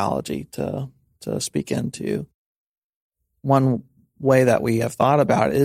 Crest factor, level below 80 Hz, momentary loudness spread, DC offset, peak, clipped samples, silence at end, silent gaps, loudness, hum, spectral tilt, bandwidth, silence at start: 20 dB; -54 dBFS; 14 LU; under 0.1%; -2 dBFS; under 0.1%; 0 s; 2.34-3.10 s; -22 LUFS; none; -6.5 dB/octave; 15.5 kHz; 0 s